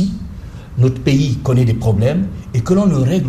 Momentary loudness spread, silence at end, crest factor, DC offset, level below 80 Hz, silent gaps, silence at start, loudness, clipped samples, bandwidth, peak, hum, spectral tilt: 14 LU; 0 s; 12 dB; under 0.1%; -34 dBFS; none; 0 s; -15 LUFS; under 0.1%; 13 kHz; -4 dBFS; none; -8 dB/octave